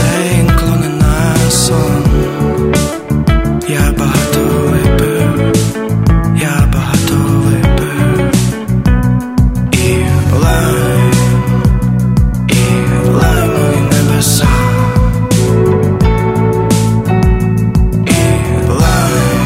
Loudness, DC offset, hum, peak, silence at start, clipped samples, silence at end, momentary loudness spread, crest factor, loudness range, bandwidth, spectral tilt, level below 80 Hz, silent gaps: -11 LUFS; under 0.1%; none; 0 dBFS; 0 s; under 0.1%; 0 s; 3 LU; 10 dB; 1 LU; 16.5 kHz; -6 dB/octave; -18 dBFS; none